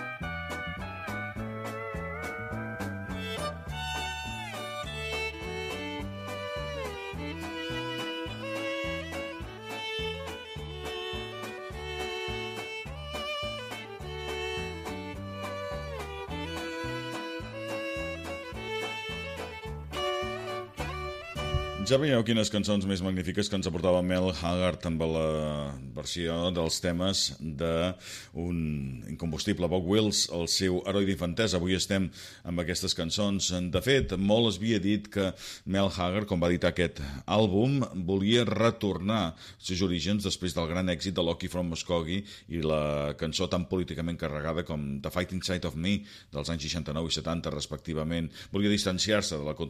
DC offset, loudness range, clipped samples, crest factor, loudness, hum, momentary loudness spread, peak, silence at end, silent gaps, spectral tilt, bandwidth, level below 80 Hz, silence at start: under 0.1%; 8 LU; under 0.1%; 18 dB; -31 LUFS; none; 11 LU; -12 dBFS; 0 s; none; -4.5 dB/octave; 15.5 kHz; -48 dBFS; 0 s